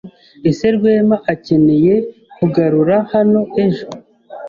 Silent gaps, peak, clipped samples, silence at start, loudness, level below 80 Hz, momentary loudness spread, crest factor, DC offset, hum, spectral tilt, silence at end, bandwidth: none; -2 dBFS; under 0.1%; 0.05 s; -14 LUFS; -50 dBFS; 8 LU; 12 dB; under 0.1%; none; -8.5 dB/octave; 0 s; 7.2 kHz